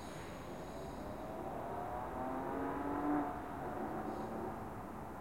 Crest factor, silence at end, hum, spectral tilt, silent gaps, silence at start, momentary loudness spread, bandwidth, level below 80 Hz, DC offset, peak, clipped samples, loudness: 18 dB; 0 s; none; -7 dB/octave; none; 0 s; 9 LU; 16.5 kHz; -58 dBFS; 0.1%; -24 dBFS; under 0.1%; -43 LUFS